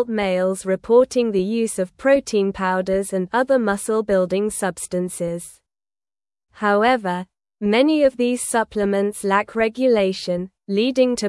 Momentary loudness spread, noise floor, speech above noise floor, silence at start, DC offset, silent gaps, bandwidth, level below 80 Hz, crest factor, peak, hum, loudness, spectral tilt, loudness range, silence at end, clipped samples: 8 LU; under -90 dBFS; over 71 dB; 0 s; under 0.1%; none; 12 kHz; -54 dBFS; 16 dB; -4 dBFS; none; -20 LUFS; -5 dB/octave; 4 LU; 0 s; under 0.1%